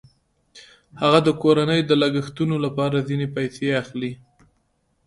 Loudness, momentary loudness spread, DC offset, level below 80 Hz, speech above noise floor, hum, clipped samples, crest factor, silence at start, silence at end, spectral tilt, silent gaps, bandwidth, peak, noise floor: -21 LUFS; 9 LU; under 0.1%; -58 dBFS; 47 dB; none; under 0.1%; 20 dB; 0.55 s; 0.9 s; -6.5 dB/octave; none; 11.5 kHz; -2 dBFS; -68 dBFS